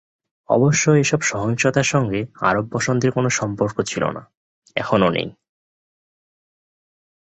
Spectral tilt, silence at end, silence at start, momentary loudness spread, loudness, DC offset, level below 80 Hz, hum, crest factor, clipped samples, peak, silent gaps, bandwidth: -5 dB/octave; 2 s; 0.5 s; 10 LU; -19 LUFS; under 0.1%; -52 dBFS; none; 18 dB; under 0.1%; -2 dBFS; 4.37-4.62 s; 8.2 kHz